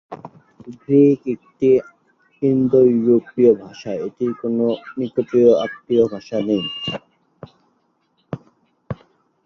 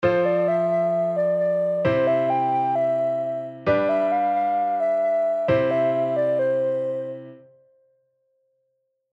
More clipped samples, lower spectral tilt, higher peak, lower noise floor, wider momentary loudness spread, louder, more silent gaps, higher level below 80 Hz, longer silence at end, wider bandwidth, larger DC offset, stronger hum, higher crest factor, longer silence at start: neither; about the same, -8 dB/octave vs -8.5 dB/octave; first, -2 dBFS vs -8 dBFS; second, -65 dBFS vs -73 dBFS; first, 20 LU vs 6 LU; first, -18 LUFS vs -22 LUFS; neither; about the same, -58 dBFS vs -60 dBFS; second, 0.5 s vs 1.8 s; second, 6.6 kHz vs 7.4 kHz; neither; neither; about the same, 18 dB vs 14 dB; about the same, 0.1 s vs 0 s